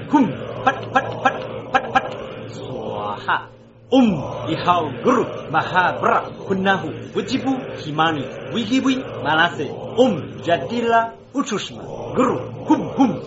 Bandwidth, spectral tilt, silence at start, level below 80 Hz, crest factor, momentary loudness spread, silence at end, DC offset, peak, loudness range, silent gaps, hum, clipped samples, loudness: 8 kHz; -4 dB/octave; 0 s; -52 dBFS; 18 dB; 9 LU; 0 s; under 0.1%; -2 dBFS; 3 LU; none; none; under 0.1%; -20 LUFS